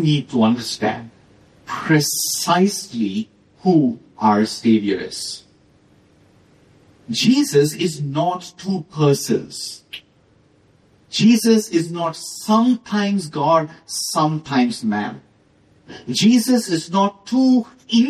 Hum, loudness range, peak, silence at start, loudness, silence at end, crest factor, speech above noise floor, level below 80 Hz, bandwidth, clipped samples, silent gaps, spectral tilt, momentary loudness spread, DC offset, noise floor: none; 4 LU; -2 dBFS; 0 s; -19 LUFS; 0 s; 18 dB; 37 dB; -62 dBFS; 14.5 kHz; under 0.1%; none; -5 dB/octave; 13 LU; under 0.1%; -55 dBFS